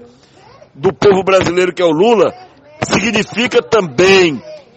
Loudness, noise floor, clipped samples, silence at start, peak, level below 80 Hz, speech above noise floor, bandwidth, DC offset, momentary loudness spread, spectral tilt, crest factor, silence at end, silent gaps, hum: -12 LUFS; -43 dBFS; under 0.1%; 0.8 s; 0 dBFS; -46 dBFS; 31 dB; 8.6 kHz; under 0.1%; 8 LU; -4.5 dB/octave; 14 dB; 0.2 s; none; none